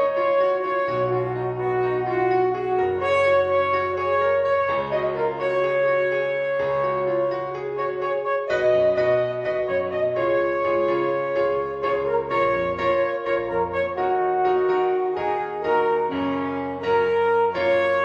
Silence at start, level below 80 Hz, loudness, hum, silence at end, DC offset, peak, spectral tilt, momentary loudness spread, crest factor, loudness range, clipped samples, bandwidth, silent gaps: 0 s; -56 dBFS; -22 LUFS; none; 0 s; under 0.1%; -8 dBFS; -7 dB/octave; 5 LU; 12 dB; 2 LU; under 0.1%; 7.6 kHz; none